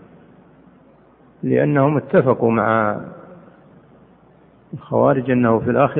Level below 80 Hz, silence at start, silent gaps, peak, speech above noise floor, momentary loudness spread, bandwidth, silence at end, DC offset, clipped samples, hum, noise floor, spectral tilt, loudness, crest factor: -56 dBFS; 1.45 s; none; -2 dBFS; 34 dB; 14 LU; 3.9 kHz; 0 s; under 0.1%; under 0.1%; none; -50 dBFS; -12.5 dB/octave; -17 LUFS; 16 dB